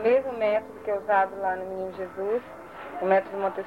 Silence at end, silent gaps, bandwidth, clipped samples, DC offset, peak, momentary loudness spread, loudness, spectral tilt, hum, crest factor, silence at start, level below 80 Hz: 0 s; none; 15.5 kHz; under 0.1%; under 0.1%; -8 dBFS; 10 LU; -27 LUFS; -6.5 dB/octave; none; 18 dB; 0 s; -66 dBFS